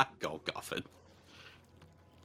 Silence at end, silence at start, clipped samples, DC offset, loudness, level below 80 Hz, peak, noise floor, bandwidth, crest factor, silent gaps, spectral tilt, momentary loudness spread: 0.4 s; 0 s; under 0.1%; under 0.1%; -39 LUFS; -70 dBFS; -10 dBFS; -61 dBFS; 17.5 kHz; 30 dB; none; -3.5 dB/octave; 23 LU